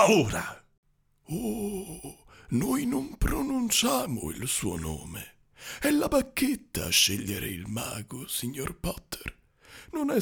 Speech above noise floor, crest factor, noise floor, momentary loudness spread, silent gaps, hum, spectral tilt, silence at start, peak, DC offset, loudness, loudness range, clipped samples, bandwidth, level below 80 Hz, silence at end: 24 dB; 22 dB; -52 dBFS; 17 LU; 0.78-0.83 s; none; -3.5 dB/octave; 0 s; -8 dBFS; under 0.1%; -29 LUFS; 4 LU; under 0.1%; over 20 kHz; -44 dBFS; 0 s